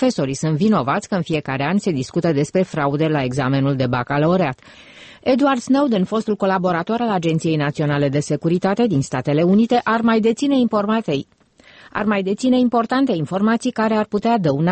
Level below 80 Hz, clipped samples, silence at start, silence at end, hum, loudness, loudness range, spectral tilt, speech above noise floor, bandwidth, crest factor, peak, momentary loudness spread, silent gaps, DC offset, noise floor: -54 dBFS; under 0.1%; 0 s; 0 s; none; -19 LUFS; 2 LU; -6.5 dB/octave; 30 dB; 8.8 kHz; 12 dB; -6 dBFS; 4 LU; none; under 0.1%; -48 dBFS